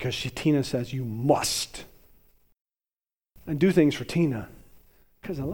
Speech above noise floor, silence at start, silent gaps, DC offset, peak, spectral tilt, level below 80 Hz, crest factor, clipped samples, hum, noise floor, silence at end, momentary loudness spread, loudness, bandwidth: over 65 dB; 0 s; 2.61-2.65 s; under 0.1%; -8 dBFS; -5.5 dB/octave; -52 dBFS; 20 dB; under 0.1%; none; under -90 dBFS; 0 s; 18 LU; -26 LUFS; 19 kHz